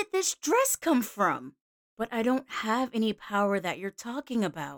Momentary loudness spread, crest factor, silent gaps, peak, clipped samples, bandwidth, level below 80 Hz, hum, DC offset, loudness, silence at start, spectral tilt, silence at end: 11 LU; 16 dB; 1.61-1.97 s; -14 dBFS; under 0.1%; over 20 kHz; -70 dBFS; none; under 0.1%; -29 LUFS; 0 s; -3.5 dB/octave; 0 s